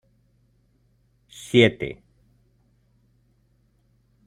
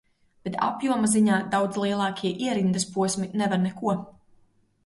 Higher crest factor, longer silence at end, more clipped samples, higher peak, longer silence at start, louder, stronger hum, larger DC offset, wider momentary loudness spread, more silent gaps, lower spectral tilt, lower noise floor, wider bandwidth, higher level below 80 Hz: first, 26 dB vs 16 dB; first, 2.35 s vs 0.75 s; neither; first, -2 dBFS vs -10 dBFS; first, 1.55 s vs 0.45 s; first, -21 LUFS vs -25 LUFS; neither; neither; first, 27 LU vs 7 LU; neither; about the same, -5.5 dB/octave vs -5 dB/octave; about the same, -64 dBFS vs -62 dBFS; about the same, 12.5 kHz vs 11.5 kHz; first, -58 dBFS vs -64 dBFS